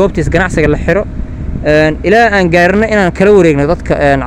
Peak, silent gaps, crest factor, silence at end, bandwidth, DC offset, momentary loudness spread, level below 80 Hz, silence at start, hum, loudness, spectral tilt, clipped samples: 0 dBFS; none; 10 dB; 0 s; 12 kHz; under 0.1%; 8 LU; -22 dBFS; 0 s; none; -9 LUFS; -6.5 dB/octave; 2%